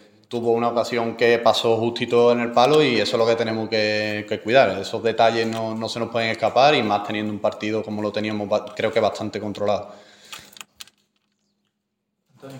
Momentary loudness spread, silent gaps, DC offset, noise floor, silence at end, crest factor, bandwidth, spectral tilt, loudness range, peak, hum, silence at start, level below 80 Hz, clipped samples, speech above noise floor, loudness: 10 LU; none; under 0.1%; -77 dBFS; 0 s; 20 dB; 17 kHz; -5 dB/octave; 8 LU; -2 dBFS; none; 0.3 s; -68 dBFS; under 0.1%; 56 dB; -21 LUFS